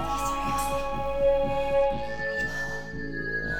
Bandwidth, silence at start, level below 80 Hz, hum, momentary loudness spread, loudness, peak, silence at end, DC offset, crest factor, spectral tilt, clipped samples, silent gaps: 17 kHz; 0 s; -40 dBFS; none; 8 LU; -28 LUFS; -14 dBFS; 0 s; 1%; 14 dB; -4.5 dB/octave; under 0.1%; none